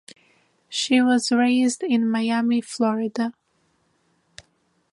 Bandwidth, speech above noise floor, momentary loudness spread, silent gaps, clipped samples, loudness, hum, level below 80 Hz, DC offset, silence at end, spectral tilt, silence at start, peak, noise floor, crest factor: 11.5 kHz; 46 dB; 9 LU; none; under 0.1%; -21 LUFS; none; -72 dBFS; under 0.1%; 1.6 s; -3.5 dB/octave; 0.7 s; -8 dBFS; -67 dBFS; 16 dB